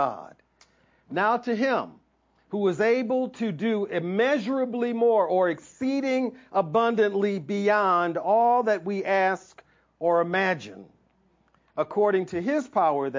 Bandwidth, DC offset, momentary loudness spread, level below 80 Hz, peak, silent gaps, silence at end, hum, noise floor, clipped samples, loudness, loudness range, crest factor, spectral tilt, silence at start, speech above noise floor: 7.6 kHz; under 0.1%; 8 LU; -72 dBFS; -10 dBFS; none; 0 s; none; -65 dBFS; under 0.1%; -25 LUFS; 4 LU; 16 dB; -6.5 dB/octave; 0 s; 41 dB